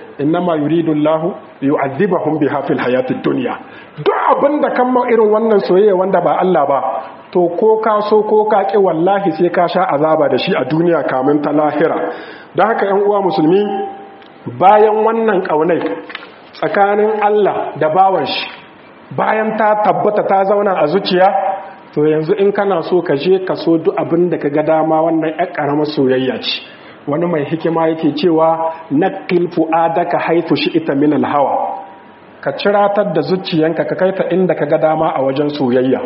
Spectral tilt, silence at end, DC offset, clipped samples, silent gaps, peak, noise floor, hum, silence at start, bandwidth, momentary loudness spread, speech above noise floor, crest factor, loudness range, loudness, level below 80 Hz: -4.5 dB/octave; 0 s; under 0.1%; under 0.1%; none; 0 dBFS; -39 dBFS; none; 0 s; 5.8 kHz; 8 LU; 25 dB; 14 dB; 3 LU; -14 LUFS; -62 dBFS